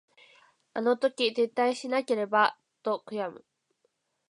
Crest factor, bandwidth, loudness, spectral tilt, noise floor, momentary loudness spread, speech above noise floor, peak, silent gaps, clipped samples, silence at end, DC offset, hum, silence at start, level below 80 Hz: 20 dB; 11 kHz; -28 LUFS; -4 dB/octave; -75 dBFS; 11 LU; 48 dB; -10 dBFS; none; under 0.1%; 0.9 s; under 0.1%; none; 0.75 s; -86 dBFS